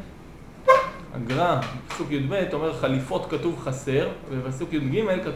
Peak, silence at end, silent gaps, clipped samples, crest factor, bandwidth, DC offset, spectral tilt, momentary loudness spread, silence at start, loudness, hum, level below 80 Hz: -2 dBFS; 0 s; none; under 0.1%; 24 dB; 16 kHz; under 0.1%; -6.5 dB/octave; 13 LU; 0 s; -25 LUFS; none; -48 dBFS